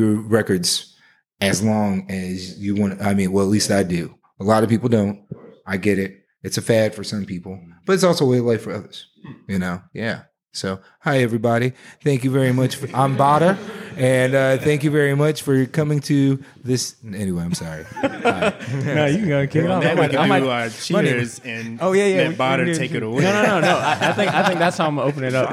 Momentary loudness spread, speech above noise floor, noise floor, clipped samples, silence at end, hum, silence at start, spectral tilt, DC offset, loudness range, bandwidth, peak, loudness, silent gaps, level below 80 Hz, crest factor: 11 LU; 37 dB; -56 dBFS; under 0.1%; 0 s; none; 0 s; -5.5 dB/octave; under 0.1%; 4 LU; 15.5 kHz; -2 dBFS; -19 LUFS; none; -58 dBFS; 18 dB